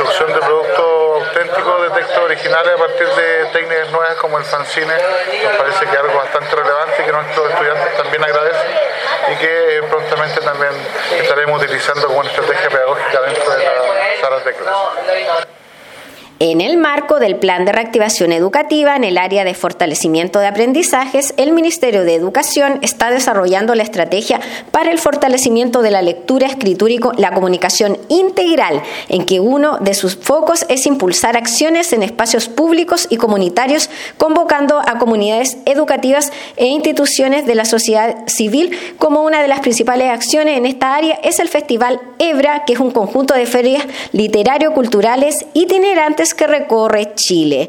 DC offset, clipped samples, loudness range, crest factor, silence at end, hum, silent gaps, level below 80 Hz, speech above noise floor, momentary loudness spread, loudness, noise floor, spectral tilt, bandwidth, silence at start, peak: under 0.1%; under 0.1%; 2 LU; 14 dB; 0 s; none; none; -56 dBFS; 23 dB; 4 LU; -13 LUFS; -36 dBFS; -3 dB/octave; 17.5 kHz; 0 s; 0 dBFS